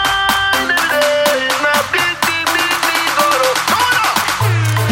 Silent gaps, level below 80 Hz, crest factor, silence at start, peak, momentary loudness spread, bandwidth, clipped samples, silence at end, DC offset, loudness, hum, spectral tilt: none; -44 dBFS; 14 dB; 0 s; 0 dBFS; 2 LU; 17 kHz; under 0.1%; 0 s; under 0.1%; -13 LUFS; none; -3 dB/octave